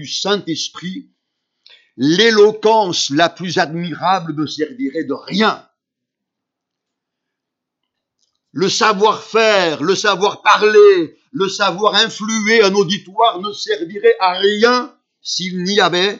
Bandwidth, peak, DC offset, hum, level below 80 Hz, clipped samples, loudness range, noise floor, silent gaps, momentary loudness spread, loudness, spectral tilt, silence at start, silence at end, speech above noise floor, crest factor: 7.8 kHz; 0 dBFS; under 0.1%; none; -70 dBFS; under 0.1%; 10 LU; -80 dBFS; none; 12 LU; -15 LUFS; -3.5 dB/octave; 0 s; 0 s; 65 dB; 16 dB